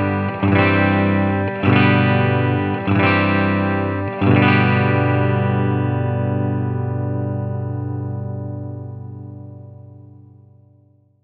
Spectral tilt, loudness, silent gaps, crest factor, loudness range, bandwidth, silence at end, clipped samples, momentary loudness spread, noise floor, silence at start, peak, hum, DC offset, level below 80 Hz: -10.5 dB/octave; -18 LUFS; none; 18 dB; 12 LU; 5 kHz; 1.2 s; under 0.1%; 16 LU; -54 dBFS; 0 s; -2 dBFS; 50 Hz at -45 dBFS; under 0.1%; -56 dBFS